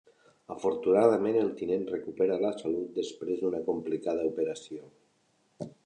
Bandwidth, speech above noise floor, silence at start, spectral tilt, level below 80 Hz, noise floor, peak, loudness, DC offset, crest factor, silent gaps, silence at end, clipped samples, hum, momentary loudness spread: 9.6 kHz; 41 dB; 0.5 s; -6.5 dB/octave; -70 dBFS; -70 dBFS; -8 dBFS; -30 LUFS; under 0.1%; 22 dB; none; 0.15 s; under 0.1%; none; 18 LU